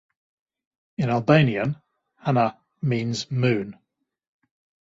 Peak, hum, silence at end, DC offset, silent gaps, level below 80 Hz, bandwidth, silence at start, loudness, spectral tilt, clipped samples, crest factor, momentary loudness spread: -4 dBFS; none; 1.15 s; under 0.1%; none; -60 dBFS; 7.8 kHz; 1 s; -23 LUFS; -7 dB/octave; under 0.1%; 22 dB; 14 LU